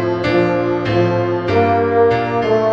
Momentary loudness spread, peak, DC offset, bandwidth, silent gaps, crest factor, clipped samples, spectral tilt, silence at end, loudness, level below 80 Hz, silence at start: 3 LU; -2 dBFS; 0.3%; 7.4 kHz; none; 12 dB; under 0.1%; -8 dB/octave; 0 s; -15 LUFS; -44 dBFS; 0 s